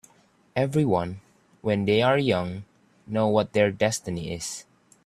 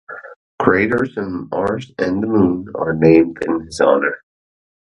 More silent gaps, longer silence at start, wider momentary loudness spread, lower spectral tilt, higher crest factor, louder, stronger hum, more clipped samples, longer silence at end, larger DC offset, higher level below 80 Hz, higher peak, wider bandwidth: second, none vs 0.36-0.58 s; first, 0.55 s vs 0.1 s; about the same, 13 LU vs 11 LU; second, -5.5 dB/octave vs -7 dB/octave; about the same, 20 dB vs 16 dB; second, -25 LUFS vs -17 LUFS; neither; neither; second, 0.45 s vs 0.7 s; neither; second, -58 dBFS vs -46 dBFS; second, -6 dBFS vs 0 dBFS; first, 13.5 kHz vs 11 kHz